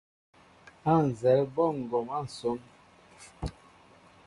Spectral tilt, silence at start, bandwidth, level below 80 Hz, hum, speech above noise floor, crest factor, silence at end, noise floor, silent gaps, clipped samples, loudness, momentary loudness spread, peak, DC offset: -7.5 dB/octave; 0.85 s; 11.5 kHz; -54 dBFS; none; 30 dB; 20 dB; 0.75 s; -57 dBFS; none; under 0.1%; -29 LUFS; 16 LU; -12 dBFS; under 0.1%